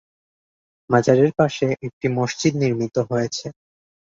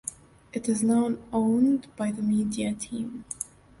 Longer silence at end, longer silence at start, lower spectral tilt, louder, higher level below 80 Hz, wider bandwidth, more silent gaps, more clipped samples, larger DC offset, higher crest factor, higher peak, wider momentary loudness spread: first, 0.6 s vs 0.35 s; first, 0.9 s vs 0.05 s; about the same, -6 dB/octave vs -5.5 dB/octave; first, -20 LUFS vs -27 LUFS; about the same, -58 dBFS vs -58 dBFS; second, 7.8 kHz vs 11.5 kHz; first, 1.93-2.01 s vs none; neither; neither; about the same, 20 dB vs 16 dB; first, -2 dBFS vs -12 dBFS; second, 9 LU vs 13 LU